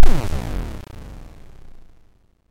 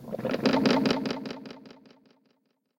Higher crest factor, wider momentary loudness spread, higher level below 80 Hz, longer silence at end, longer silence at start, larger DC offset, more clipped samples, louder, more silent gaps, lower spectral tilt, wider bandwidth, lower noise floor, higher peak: second, 16 dB vs 22 dB; first, 24 LU vs 20 LU; first, -20 dBFS vs -64 dBFS; first, 1.75 s vs 1.1 s; about the same, 0 s vs 0 s; neither; neither; about the same, -28 LUFS vs -27 LUFS; neither; about the same, -6 dB/octave vs -5.5 dB/octave; second, 6.6 kHz vs 16.5 kHz; second, -54 dBFS vs -73 dBFS; first, 0 dBFS vs -8 dBFS